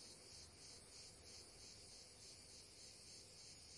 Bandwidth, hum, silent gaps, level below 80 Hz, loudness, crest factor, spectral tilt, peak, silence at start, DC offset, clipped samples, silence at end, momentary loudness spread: 12 kHz; none; none; -76 dBFS; -58 LUFS; 14 dB; -1.5 dB/octave; -48 dBFS; 0 s; under 0.1%; under 0.1%; 0 s; 1 LU